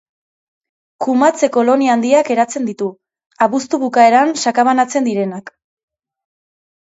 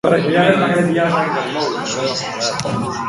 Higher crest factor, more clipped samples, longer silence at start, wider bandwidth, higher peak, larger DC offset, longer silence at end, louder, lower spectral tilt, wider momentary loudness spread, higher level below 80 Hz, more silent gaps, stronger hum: about the same, 16 dB vs 16 dB; neither; first, 1 s vs 0.05 s; second, 8 kHz vs 11.5 kHz; about the same, 0 dBFS vs 0 dBFS; neither; first, 1.4 s vs 0 s; first, -14 LUFS vs -17 LUFS; about the same, -4 dB/octave vs -4.5 dB/octave; first, 12 LU vs 7 LU; second, -68 dBFS vs -52 dBFS; first, 3.26-3.30 s vs none; neither